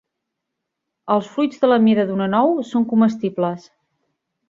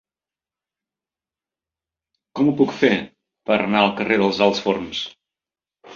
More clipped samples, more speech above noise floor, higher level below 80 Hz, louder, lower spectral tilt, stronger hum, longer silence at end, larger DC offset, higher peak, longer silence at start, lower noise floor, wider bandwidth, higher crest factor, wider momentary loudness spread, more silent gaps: neither; second, 62 dB vs over 71 dB; about the same, -64 dBFS vs -60 dBFS; about the same, -18 LUFS vs -19 LUFS; first, -7.5 dB/octave vs -5.5 dB/octave; neither; first, 0.9 s vs 0 s; neither; about the same, -2 dBFS vs -2 dBFS; second, 1.05 s vs 2.35 s; second, -80 dBFS vs under -90 dBFS; about the same, 7.4 kHz vs 7.4 kHz; about the same, 18 dB vs 20 dB; second, 9 LU vs 16 LU; neither